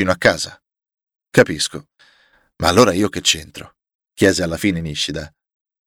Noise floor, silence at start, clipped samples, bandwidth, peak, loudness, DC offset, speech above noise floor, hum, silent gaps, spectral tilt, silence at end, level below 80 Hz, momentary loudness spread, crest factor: -57 dBFS; 0 s; under 0.1%; 18 kHz; 0 dBFS; -17 LUFS; under 0.1%; 40 dB; none; 3.95-3.99 s; -3.5 dB/octave; 0.6 s; -44 dBFS; 17 LU; 18 dB